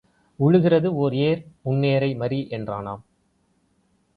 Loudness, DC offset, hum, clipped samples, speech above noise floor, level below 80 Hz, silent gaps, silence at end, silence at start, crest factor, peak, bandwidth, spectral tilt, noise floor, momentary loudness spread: -22 LUFS; under 0.1%; none; under 0.1%; 45 dB; -58 dBFS; none; 1.15 s; 0.4 s; 16 dB; -6 dBFS; 4.9 kHz; -10 dB/octave; -66 dBFS; 13 LU